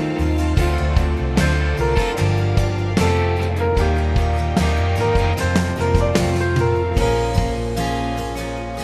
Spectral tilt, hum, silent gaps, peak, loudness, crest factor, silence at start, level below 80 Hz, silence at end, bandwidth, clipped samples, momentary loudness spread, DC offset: -6.5 dB/octave; none; none; -2 dBFS; -19 LUFS; 16 dB; 0 s; -24 dBFS; 0 s; 13.5 kHz; under 0.1%; 4 LU; under 0.1%